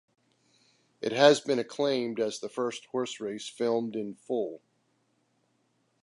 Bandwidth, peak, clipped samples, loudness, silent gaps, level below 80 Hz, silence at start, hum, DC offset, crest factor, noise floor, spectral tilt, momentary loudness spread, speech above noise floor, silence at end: 11.5 kHz; -6 dBFS; under 0.1%; -29 LUFS; none; -84 dBFS; 1 s; none; under 0.1%; 24 dB; -73 dBFS; -4 dB/octave; 15 LU; 44 dB; 1.45 s